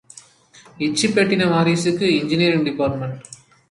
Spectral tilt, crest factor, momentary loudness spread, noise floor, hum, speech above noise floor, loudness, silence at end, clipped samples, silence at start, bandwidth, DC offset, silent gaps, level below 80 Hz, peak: -5 dB/octave; 16 dB; 10 LU; -49 dBFS; none; 31 dB; -18 LUFS; 0.35 s; under 0.1%; 0.75 s; 11.5 kHz; under 0.1%; none; -54 dBFS; -4 dBFS